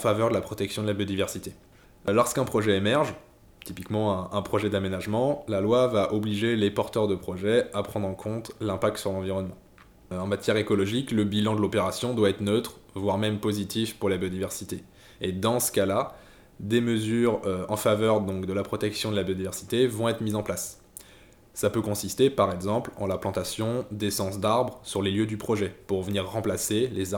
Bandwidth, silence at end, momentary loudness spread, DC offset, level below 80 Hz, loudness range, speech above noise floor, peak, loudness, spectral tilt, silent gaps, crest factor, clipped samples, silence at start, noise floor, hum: over 20 kHz; 0 s; 9 LU; under 0.1%; -58 dBFS; 3 LU; 27 dB; -8 dBFS; -27 LUFS; -5 dB/octave; none; 18 dB; under 0.1%; 0 s; -53 dBFS; none